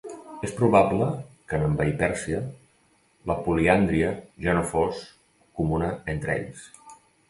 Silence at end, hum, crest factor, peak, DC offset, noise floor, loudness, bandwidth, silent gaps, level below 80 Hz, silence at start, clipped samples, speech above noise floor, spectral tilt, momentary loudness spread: 0.35 s; none; 22 dB; -4 dBFS; under 0.1%; -63 dBFS; -25 LUFS; 11.5 kHz; none; -44 dBFS; 0.05 s; under 0.1%; 39 dB; -7 dB/octave; 18 LU